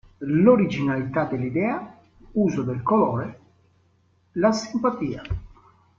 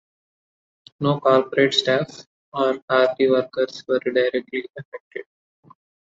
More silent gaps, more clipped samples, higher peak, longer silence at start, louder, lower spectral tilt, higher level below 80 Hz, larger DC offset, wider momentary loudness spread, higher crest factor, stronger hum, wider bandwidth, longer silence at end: second, none vs 2.27-2.52 s, 2.82-2.88 s, 4.85-4.92 s, 5.00-5.11 s; neither; about the same, -4 dBFS vs -4 dBFS; second, 0.2 s vs 1 s; about the same, -23 LUFS vs -21 LUFS; first, -7.5 dB/octave vs -5 dB/octave; first, -48 dBFS vs -68 dBFS; neither; second, 15 LU vs 18 LU; about the same, 20 dB vs 18 dB; neither; about the same, 7.4 kHz vs 7.8 kHz; second, 0.5 s vs 0.8 s